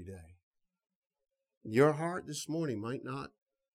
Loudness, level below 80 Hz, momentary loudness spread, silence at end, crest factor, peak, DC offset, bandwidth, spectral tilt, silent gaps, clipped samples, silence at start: -34 LUFS; -70 dBFS; 22 LU; 0.45 s; 22 dB; -14 dBFS; under 0.1%; 15 kHz; -6 dB/octave; 0.43-0.51 s, 0.95-1.02 s, 1.57-1.61 s; under 0.1%; 0 s